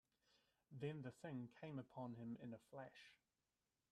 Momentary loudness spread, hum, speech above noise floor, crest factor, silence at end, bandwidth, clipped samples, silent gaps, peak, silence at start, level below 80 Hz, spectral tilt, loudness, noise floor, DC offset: 11 LU; none; over 36 dB; 18 dB; 0.75 s; 12.5 kHz; under 0.1%; none; -38 dBFS; 0.7 s; -88 dBFS; -7.5 dB/octave; -55 LUFS; under -90 dBFS; under 0.1%